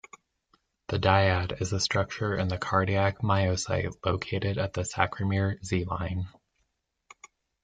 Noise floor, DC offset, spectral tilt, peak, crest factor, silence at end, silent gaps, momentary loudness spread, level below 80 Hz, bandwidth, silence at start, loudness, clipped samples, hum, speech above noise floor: -77 dBFS; under 0.1%; -5 dB/octave; -6 dBFS; 24 dB; 1.35 s; none; 8 LU; -54 dBFS; 9.4 kHz; 0.9 s; -28 LUFS; under 0.1%; none; 50 dB